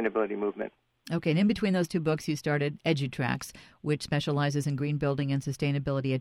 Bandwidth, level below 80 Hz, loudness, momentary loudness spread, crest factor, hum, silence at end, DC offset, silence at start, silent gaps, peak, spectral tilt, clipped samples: 14.5 kHz; -58 dBFS; -29 LUFS; 8 LU; 16 dB; none; 0 s; under 0.1%; 0 s; none; -14 dBFS; -6.5 dB/octave; under 0.1%